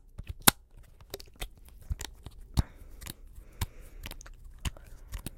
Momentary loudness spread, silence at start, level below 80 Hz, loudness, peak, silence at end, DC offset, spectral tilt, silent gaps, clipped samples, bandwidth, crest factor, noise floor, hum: 25 LU; 0.05 s; -42 dBFS; -32 LUFS; 0 dBFS; 0 s; under 0.1%; -2.5 dB/octave; none; under 0.1%; 17 kHz; 36 dB; -53 dBFS; none